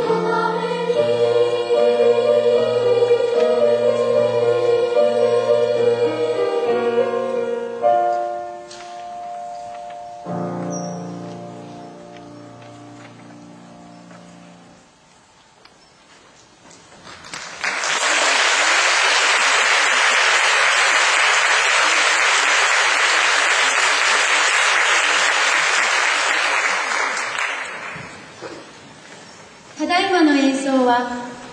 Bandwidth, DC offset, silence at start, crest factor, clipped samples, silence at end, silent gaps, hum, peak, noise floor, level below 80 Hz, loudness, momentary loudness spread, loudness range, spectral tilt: 11 kHz; under 0.1%; 0 s; 16 dB; under 0.1%; 0 s; none; none; -2 dBFS; -51 dBFS; -64 dBFS; -16 LUFS; 19 LU; 16 LU; -2 dB/octave